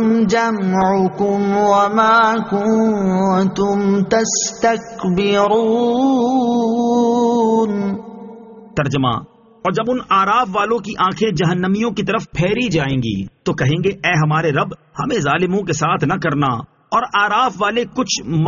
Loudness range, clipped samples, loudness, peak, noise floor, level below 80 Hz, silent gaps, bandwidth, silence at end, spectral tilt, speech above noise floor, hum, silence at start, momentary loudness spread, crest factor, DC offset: 3 LU; under 0.1%; -16 LUFS; -2 dBFS; -37 dBFS; -48 dBFS; none; 7.4 kHz; 0 s; -5 dB/octave; 21 dB; none; 0 s; 7 LU; 14 dB; under 0.1%